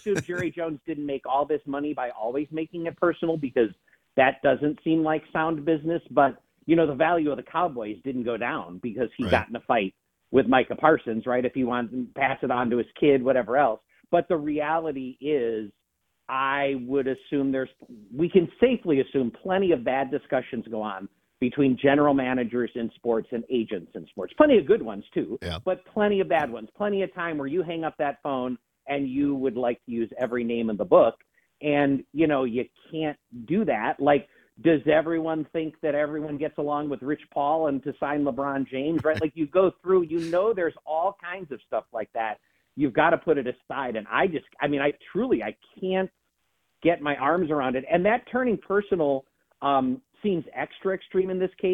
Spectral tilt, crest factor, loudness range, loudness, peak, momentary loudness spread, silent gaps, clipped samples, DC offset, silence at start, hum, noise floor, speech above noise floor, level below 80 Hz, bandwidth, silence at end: -7.5 dB/octave; 22 dB; 3 LU; -26 LUFS; -4 dBFS; 10 LU; none; under 0.1%; under 0.1%; 0.05 s; none; -76 dBFS; 51 dB; -60 dBFS; 9.8 kHz; 0 s